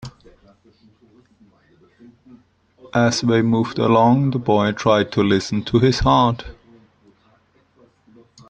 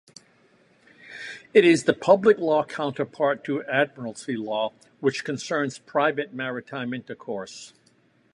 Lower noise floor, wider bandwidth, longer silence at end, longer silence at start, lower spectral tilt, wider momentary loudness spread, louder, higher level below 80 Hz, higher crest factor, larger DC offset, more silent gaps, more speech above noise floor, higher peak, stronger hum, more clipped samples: second, -58 dBFS vs -62 dBFS; second, 9 kHz vs 11 kHz; first, 2 s vs 0.65 s; second, 0 s vs 1.05 s; about the same, -6 dB/octave vs -5 dB/octave; second, 6 LU vs 16 LU; first, -17 LUFS vs -24 LUFS; first, -42 dBFS vs -72 dBFS; about the same, 18 dB vs 22 dB; neither; neither; about the same, 40 dB vs 38 dB; about the same, -2 dBFS vs -2 dBFS; neither; neither